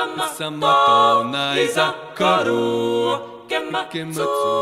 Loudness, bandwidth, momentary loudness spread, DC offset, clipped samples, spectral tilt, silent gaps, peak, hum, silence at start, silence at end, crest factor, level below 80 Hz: -19 LUFS; 15.5 kHz; 11 LU; under 0.1%; under 0.1%; -4 dB/octave; none; -4 dBFS; none; 0 s; 0 s; 16 dB; -64 dBFS